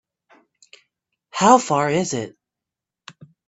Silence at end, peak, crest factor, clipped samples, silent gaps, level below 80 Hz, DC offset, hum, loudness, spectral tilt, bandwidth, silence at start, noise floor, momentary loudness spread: 1.2 s; 0 dBFS; 22 dB; under 0.1%; none; -64 dBFS; under 0.1%; none; -18 LUFS; -4.5 dB/octave; 8.4 kHz; 1.35 s; -86 dBFS; 17 LU